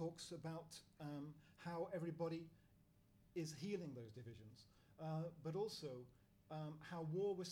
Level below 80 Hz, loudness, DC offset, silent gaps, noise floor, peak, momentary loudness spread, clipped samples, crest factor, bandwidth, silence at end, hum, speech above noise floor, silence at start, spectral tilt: -80 dBFS; -50 LUFS; under 0.1%; none; -73 dBFS; -34 dBFS; 13 LU; under 0.1%; 16 dB; 19 kHz; 0 s; none; 24 dB; 0 s; -6 dB/octave